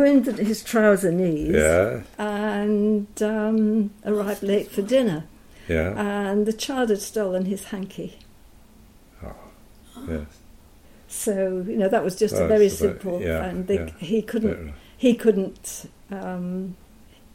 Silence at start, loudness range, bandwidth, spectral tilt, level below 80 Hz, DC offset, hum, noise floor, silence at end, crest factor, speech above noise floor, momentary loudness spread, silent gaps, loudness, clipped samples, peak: 0 s; 10 LU; 16.5 kHz; -5.5 dB/octave; -44 dBFS; under 0.1%; none; -50 dBFS; 0.6 s; 18 dB; 28 dB; 16 LU; none; -23 LUFS; under 0.1%; -4 dBFS